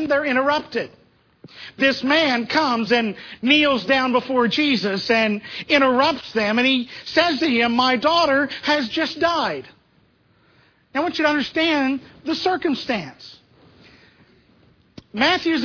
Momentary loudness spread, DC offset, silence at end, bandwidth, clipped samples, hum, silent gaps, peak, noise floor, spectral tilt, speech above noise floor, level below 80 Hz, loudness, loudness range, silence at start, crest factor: 10 LU; under 0.1%; 0 s; 5.4 kHz; under 0.1%; none; none; -2 dBFS; -59 dBFS; -4.5 dB/octave; 39 dB; -58 dBFS; -19 LUFS; 6 LU; 0 s; 18 dB